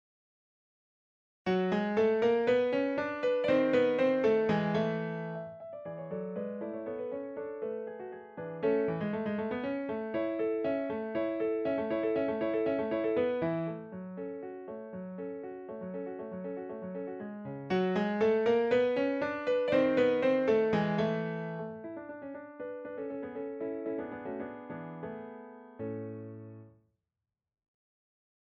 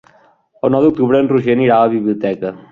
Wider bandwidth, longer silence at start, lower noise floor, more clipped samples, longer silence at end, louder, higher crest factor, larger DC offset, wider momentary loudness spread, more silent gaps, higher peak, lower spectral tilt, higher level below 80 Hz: first, 7.4 kHz vs 4.9 kHz; first, 1.45 s vs 0.65 s; first, under -90 dBFS vs -51 dBFS; neither; first, 1.75 s vs 0.1 s; second, -32 LUFS vs -14 LUFS; about the same, 16 dB vs 14 dB; neither; first, 16 LU vs 8 LU; neither; second, -16 dBFS vs -2 dBFS; second, -8 dB/octave vs -9.5 dB/octave; second, -70 dBFS vs -52 dBFS